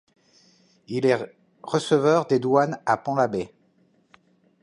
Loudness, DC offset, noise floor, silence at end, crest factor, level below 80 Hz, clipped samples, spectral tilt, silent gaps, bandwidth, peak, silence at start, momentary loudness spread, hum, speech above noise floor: -23 LUFS; under 0.1%; -63 dBFS; 1.15 s; 20 dB; -66 dBFS; under 0.1%; -6 dB/octave; none; 11 kHz; -6 dBFS; 0.9 s; 14 LU; none; 41 dB